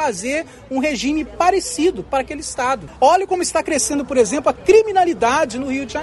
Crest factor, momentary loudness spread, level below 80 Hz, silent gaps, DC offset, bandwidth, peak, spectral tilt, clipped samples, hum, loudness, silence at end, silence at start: 16 dB; 9 LU; -44 dBFS; none; under 0.1%; 12 kHz; -2 dBFS; -3 dB/octave; under 0.1%; none; -18 LUFS; 0 s; 0 s